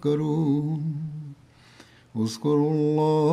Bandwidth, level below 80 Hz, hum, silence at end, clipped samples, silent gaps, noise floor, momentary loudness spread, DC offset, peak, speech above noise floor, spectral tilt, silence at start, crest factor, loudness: 11.5 kHz; -66 dBFS; none; 0 s; under 0.1%; none; -52 dBFS; 15 LU; under 0.1%; -10 dBFS; 29 dB; -8 dB/octave; 0 s; 14 dB; -25 LUFS